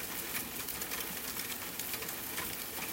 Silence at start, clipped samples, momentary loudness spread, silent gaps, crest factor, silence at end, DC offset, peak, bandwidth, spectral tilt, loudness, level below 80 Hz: 0 s; under 0.1%; 1 LU; none; 20 dB; 0 s; under 0.1%; -20 dBFS; 16.5 kHz; -1.5 dB/octave; -37 LUFS; -62 dBFS